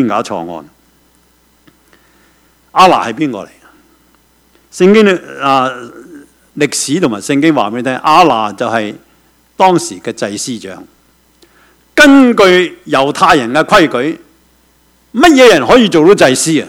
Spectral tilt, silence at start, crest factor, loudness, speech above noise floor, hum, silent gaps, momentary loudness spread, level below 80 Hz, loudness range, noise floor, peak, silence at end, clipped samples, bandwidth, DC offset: -4 dB/octave; 0 s; 12 dB; -9 LUFS; 42 dB; none; none; 16 LU; -46 dBFS; 7 LU; -51 dBFS; 0 dBFS; 0 s; 1%; 17 kHz; under 0.1%